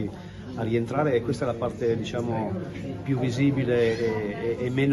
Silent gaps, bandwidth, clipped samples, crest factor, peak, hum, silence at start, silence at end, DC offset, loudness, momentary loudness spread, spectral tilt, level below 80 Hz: none; 12 kHz; under 0.1%; 14 dB; -12 dBFS; none; 0 s; 0 s; under 0.1%; -27 LUFS; 10 LU; -7.5 dB/octave; -52 dBFS